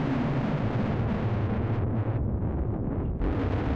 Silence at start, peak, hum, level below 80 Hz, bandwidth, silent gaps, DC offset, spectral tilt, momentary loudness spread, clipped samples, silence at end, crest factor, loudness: 0 s; -20 dBFS; none; -36 dBFS; 6.2 kHz; none; under 0.1%; -9.5 dB/octave; 3 LU; under 0.1%; 0 s; 6 dB; -29 LUFS